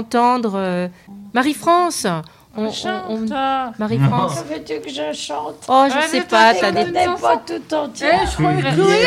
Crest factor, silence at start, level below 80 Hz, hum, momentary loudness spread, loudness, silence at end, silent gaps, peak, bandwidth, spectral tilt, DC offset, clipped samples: 18 dB; 0 s; -42 dBFS; none; 12 LU; -18 LUFS; 0 s; none; 0 dBFS; 16 kHz; -5 dB/octave; under 0.1%; under 0.1%